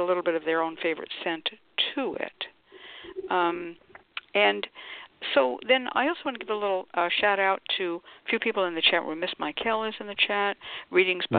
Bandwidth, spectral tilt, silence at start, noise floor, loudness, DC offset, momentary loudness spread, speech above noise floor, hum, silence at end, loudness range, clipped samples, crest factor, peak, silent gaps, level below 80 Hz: 4.7 kHz; -7.5 dB/octave; 0 s; -49 dBFS; -27 LUFS; under 0.1%; 15 LU; 22 dB; none; 0 s; 4 LU; under 0.1%; 22 dB; -6 dBFS; none; -70 dBFS